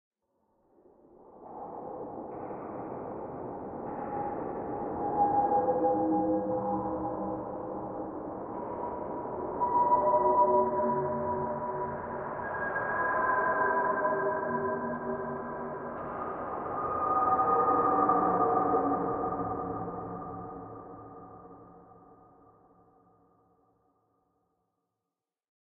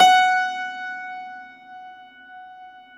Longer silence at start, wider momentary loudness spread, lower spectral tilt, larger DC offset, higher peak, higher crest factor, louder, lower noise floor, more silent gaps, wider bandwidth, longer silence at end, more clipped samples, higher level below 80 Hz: first, 1.2 s vs 0 s; second, 15 LU vs 25 LU; first, -11.5 dB/octave vs 0 dB/octave; neither; second, -12 dBFS vs -2 dBFS; about the same, 20 dB vs 20 dB; second, -31 LUFS vs -21 LUFS; first, -89 dBFS vs -44 dBFS; neither; second, 3.1 kHz vs 14 kHz; first, 3.5 s vs 0.3 s; neither; first, -60 dBFS vs -72 dBFS